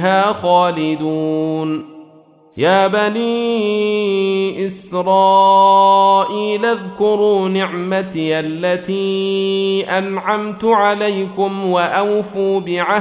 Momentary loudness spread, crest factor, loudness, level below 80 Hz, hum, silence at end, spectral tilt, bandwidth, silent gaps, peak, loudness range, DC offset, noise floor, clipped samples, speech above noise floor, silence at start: 9 LU; 14 dB; -15 LUFS; -60 dBFS; none; 0 s; -10 dB/octave; 4 kHz; none; -2 dBFS; 4 LU; under 0.1%; -46 dBFS; under 0.1%; 31 dB; 0 s